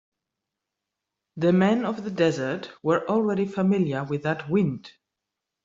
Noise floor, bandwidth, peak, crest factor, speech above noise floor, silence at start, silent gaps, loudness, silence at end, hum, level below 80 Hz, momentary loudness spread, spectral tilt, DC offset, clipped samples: -85 dBFS; 7.6 kHz; -8 dBFS; 18 dB; 61 dB; 1.35 s; none; -24 LUFS; 0.75 s; none; -66 dBFS; 8 LU; -7.5 dB/octave; under 0.1%; under 0.1%